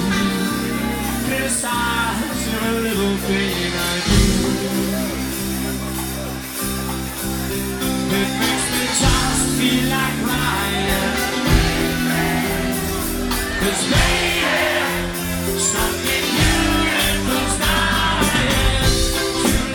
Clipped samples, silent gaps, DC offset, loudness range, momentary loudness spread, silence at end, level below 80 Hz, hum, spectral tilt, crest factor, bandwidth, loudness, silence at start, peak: under 0.1%; none; under 0.1%; 4 LU; 7 LU; 0 s; -28 dBFS; none; -3.5 dB/octave; 18 dB; 19.5 kHz; -19 LUFS; 0 s; -2 dBFS